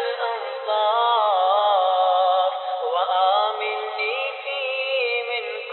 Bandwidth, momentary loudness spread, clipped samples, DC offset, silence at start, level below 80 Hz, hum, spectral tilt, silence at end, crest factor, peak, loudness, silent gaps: 4.3 kHz; 8 LU; under 0.1%; under 0.1%; 0 s; under -90 dBFS; none; -1.5 dB/octave; 0 s; 12 dB; -8 dBFS; -21 LUFS; none